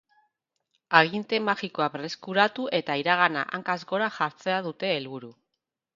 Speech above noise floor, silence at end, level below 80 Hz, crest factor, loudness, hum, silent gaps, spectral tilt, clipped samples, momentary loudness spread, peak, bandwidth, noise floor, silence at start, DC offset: 57 dB; 0.65 s; -76 dBFS; 26 dB; -26 LUFS; none; none; -5 dB/octave; under 0.1%; 9 LU; 0 dBFS; 7.6 kHz; -84 dBFS; 0.9 s; under 0.1%